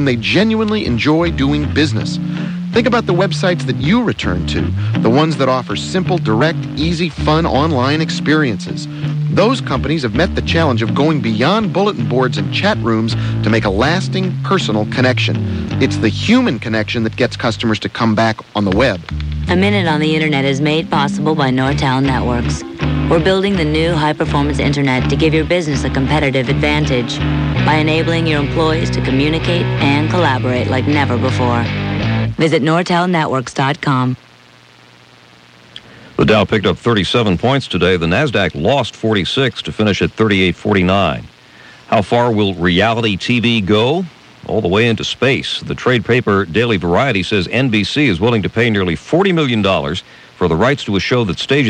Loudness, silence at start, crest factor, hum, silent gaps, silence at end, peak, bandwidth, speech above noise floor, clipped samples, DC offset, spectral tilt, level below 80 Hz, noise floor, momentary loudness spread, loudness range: -15 LUFS; 0 s; 14 dB; none; none; 0 s; 0 dBFS; 10 kHz; 30 dB; under 0.1%; under 0.1%; -6 dB/octave; -32 dBFS; -44 dBFS; 5 LU; 1 LU